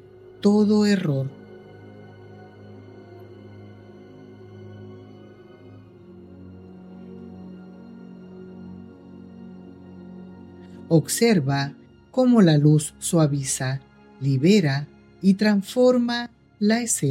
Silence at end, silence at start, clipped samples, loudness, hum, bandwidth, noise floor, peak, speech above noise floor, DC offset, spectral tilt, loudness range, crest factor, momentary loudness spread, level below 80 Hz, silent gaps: 0 s; 0.45 s; under 0.1%; -21 LUFS; none; 16 kHz; -46 dBFS; -6 dBFS; 27 dB; under 0.1%; -5.5 dB/octave; 24 LU; 18 dB; 26 LU; -64 dBFS; none